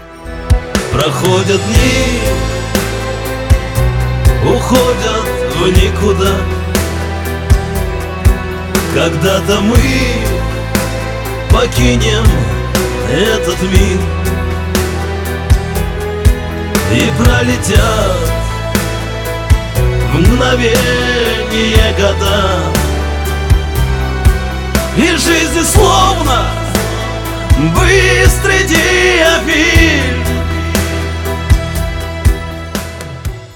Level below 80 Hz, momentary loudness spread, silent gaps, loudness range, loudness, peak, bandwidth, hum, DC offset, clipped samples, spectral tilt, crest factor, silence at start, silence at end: -18 dBFS; 9 LU; none; 4 LU; -12 LUFS; 0 dBFS; 18.5 kHz; none; under 0.1%; 0.2%; -4.5 dB/octave; 12 dB; 0 s; 0 s